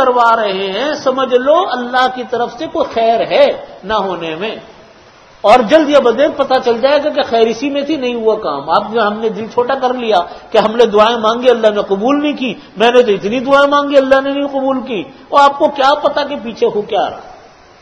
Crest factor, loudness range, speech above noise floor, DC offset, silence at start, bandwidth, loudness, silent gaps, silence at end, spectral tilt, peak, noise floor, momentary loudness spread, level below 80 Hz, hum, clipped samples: 12 dB; 3 LU; 29 dB; under 0.1%; 0 s; 9.6 kHz; -13 LUFS; none; 0.45 s; -4.5 dB/octave; 0 dBFS; -41 dBFS; 9 LU; -50 dBFS; none; 0.4%